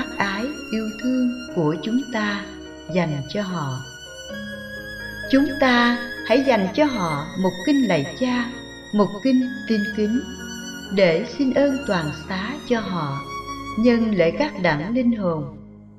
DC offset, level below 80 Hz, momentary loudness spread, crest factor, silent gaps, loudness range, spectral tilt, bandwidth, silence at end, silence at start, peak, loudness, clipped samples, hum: under 0.1%; -48 dBFS; 14 LU; 18 dB; none; 6 LU; -6 dB/octave; 14 kHz; 0 s; 0 s; -4 dBFS; -22 LUFS; under 0.1%; none